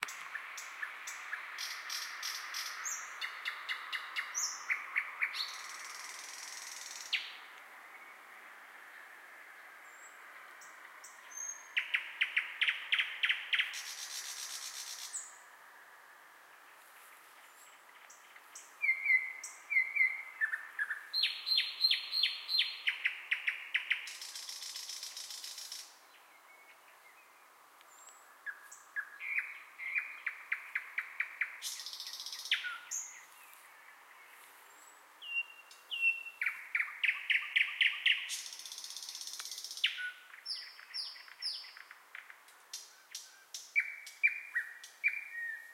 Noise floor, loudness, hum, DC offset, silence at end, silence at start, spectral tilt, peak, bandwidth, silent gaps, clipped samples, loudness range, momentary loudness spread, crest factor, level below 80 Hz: -61 dBFS; -35 LUFS; none; under 0.1%; 0 s; 0 s; 5 dB/octave; -16 dBFS; 16.5 kHz; none; under 0.1%; 15 LU; 24 LU; 24 dB; under -90 dBFS